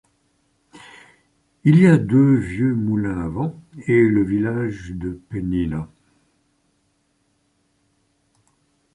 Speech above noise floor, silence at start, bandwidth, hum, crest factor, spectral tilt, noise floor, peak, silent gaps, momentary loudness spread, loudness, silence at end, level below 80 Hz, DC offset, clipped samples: 48 dB; 0.75 s; 11 kHz; none; 18 dB; -9 dB/octave; -66 dBFS; -2 dBFS; none; 16 LU; -19 LUFS; 3.1 s; -46 dBFS; under 0.1%; under 0.1%